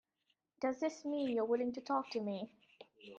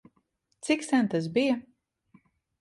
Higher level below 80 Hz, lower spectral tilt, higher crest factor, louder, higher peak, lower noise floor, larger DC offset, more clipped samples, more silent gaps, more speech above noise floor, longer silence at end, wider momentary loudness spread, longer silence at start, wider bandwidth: second, -84 dBFS vs -72 dBFS; about the same, -5.5 dB/octave vs -5 dB/octave; about the same, 16 dB vs 18 dB; second, -38 LUFS vs -27 LUFS; second, -22 dBFS vs -12 dBFS; first, -83 dBFS vs -73 dBFS; neither; neither; neither; about the same, 45 dB vs 47 dB; second, 0 s vs 1 s; first, 10 LU vs 7 LU; about the same, 0.6 s vs 0.65 s; second, 7.8 kHz vs 11.5 kHz